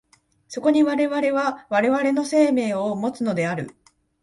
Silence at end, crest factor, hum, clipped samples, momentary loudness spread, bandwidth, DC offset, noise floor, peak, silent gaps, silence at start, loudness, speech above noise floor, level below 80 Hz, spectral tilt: 0.5 s; 16 dB; none; under 0.1%; 7 LU; 11.5 kHz; under 0.1%; -49 dBFS; -6 dBFS; none; 0.5 s; -21 LUFS; 28 dB; -66 dBFS; -6 dB/octave